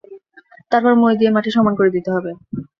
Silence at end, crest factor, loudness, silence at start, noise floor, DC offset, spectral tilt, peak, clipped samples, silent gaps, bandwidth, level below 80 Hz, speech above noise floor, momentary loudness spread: 0.15 s; 16 dB; -16 LUFS; 0.1 s; -48 dBFS; under 0.1%; -8 dB/octave; -2 dBFS; under 0.1%; none; 6.6 kHz; -58 dBFS; 33 dB; 10 LU